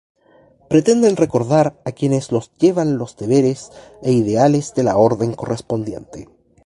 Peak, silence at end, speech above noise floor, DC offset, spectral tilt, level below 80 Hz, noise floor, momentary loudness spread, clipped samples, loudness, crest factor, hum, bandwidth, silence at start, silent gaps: 0 dBFS; 0.4 s; 35 dB; under 0.1%; -7 dB/octave; -52 dBFS; -52 dBFS; 11 LU; under 0.1%; -17 LUFS; 16 dB; none; 11.5 kHz; 0.7 s; none